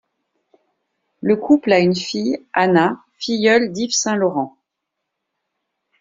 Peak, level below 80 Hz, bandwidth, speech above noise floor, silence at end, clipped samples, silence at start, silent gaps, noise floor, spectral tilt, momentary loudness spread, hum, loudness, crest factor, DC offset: -2 dBFS; -62 dBFS; 7.8 kHz; 62 dB; 1.5 s; under 0.1%; 1.25 s; none; -79 dBFS; -4.5 dB/octave; 10 LU; none; -17 LUFS; 18 dB; under 0.1%